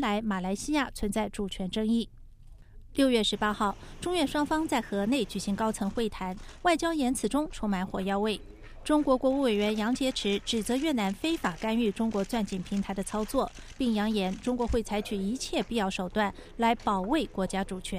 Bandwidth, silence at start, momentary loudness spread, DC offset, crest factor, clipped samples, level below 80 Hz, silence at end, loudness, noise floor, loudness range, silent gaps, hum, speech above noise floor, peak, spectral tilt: 15.5 kHz; 0 s; 6 LU; under 0.1%; 16 dB; under 0.1%; -46 dBFS; 0 s; -29 LUFS; -50 dBFS; 2 LU; none; none; 21 dB; -12 dBFS; -4.5 dB/octave